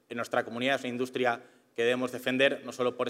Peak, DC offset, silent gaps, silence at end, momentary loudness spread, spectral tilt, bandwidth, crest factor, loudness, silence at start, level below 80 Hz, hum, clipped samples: -10 dBFS; under 0.1%; none; 0 s; 7 LU; -4 dB/octave; 16 kHz; 20 dB; -30 LUFS; 0.1 s; -82 dBFS; none; under 0.1%